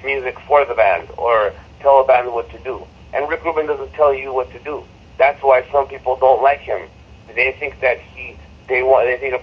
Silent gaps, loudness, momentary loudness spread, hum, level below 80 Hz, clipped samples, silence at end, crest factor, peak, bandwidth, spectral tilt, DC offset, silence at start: none; -17 LUFS; 15 LU; none; -44 dBFS; under 0.1%; 0 s; 18 dB; 0 dBFS; 6.4 kHz; -6.5 dB/octave; under 0.1%; 0 s